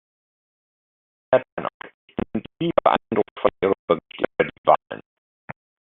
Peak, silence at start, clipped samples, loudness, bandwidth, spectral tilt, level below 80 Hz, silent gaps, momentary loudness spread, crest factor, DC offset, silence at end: -2 dBFS; 1.3 s; under 0.1%; -23 LUFS; 4.1 kHz; -4 dB/octave; -56 dBFS; 1.52-1.57 s, 1.74-1.80 s, 1.94-2.08 s, 3.31-3.36 s, 3.79-3.88 s, 4.58-4.64 s; 19 LU; 22 dB; under 0.1%; 0.95 s